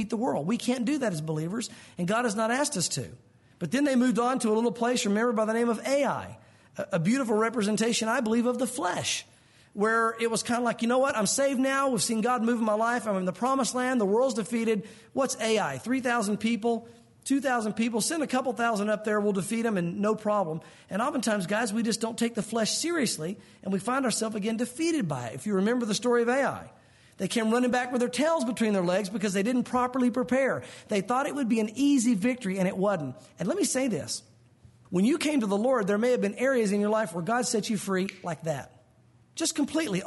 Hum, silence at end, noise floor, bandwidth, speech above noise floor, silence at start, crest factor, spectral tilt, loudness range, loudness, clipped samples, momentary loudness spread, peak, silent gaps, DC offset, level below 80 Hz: none; 0 s; -60 dBFS; 11.5 kHz; 33 dB; 0 s; 12 dB; -4.5 dB/octave; 3 LU; -27 LUFS; under 0.1%; 8 LU; -16 dBFS; none; under 0.1%; -70 dBFS